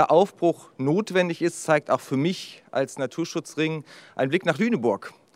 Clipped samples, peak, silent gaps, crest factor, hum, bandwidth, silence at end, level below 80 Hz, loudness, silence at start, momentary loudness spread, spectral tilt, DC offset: under 0.1%; -4 dBFS; none; 20 dB; none; 15.5 kHz; 0.25 s; -78 dBFS; -25 LUFS; 0 s; 8 LU; -5.5 dB/octave; under 0.1%